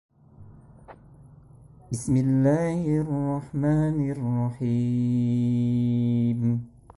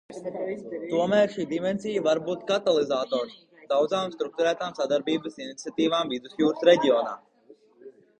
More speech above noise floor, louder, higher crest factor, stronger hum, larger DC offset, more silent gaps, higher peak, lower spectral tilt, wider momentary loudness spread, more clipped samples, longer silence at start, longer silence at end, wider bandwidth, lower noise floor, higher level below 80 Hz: second, 27 dB vs 31 dB; about the same, -25 LUFS vs -26 LUFS; about the same, 16 dB vs 20 dB; neither; neither; neither; second, -10 dBFS vs -6 dBFS; first, -8.5 dB/octave vs -5 dB/octave; second, 5 LU vs 12 LU; neither; first, 0.4 s vs 0.1 s; about the same, 0.3 s vs 0.3 s; first, 11.5 kHz vs 9.4 kHz; second, -50 dBFS vs -56 dBFS; first, -52 dBFS vs -70 dBFS